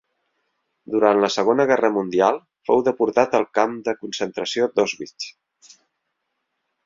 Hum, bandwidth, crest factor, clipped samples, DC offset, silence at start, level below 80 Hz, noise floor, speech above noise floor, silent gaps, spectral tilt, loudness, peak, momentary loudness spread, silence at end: none; 7.8 kHz; 20 dB; under 0.1%; under 0.1%; 0.9 s; -66 dBFS; -76 dBFS; 57 dB; none; -4.5 dB/octave; -20 LUFS; -2 dBFS; 10 LU; 1.55 s